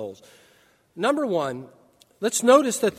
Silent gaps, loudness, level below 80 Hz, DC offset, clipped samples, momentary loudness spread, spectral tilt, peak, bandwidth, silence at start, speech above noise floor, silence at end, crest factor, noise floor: none; -22 LUFS; -70 dBFS; under 0.1%; under 0.1%; 16 LU; -3.5 dB/octave; -4 dBFS; 16 kHz; 0 s; 37 dB; 0.05 s; 20 dB; -60 dBFS